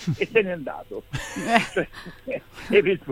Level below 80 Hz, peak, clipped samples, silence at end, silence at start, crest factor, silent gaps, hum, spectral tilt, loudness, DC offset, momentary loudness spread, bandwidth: -50 dBFS; 0 dBFS; under 0.1%; 0 s; 0 s; 24 dB; none; none; -5 dB/octave; -24 LUFS; under 0.1%; 14 LU; 16 kHz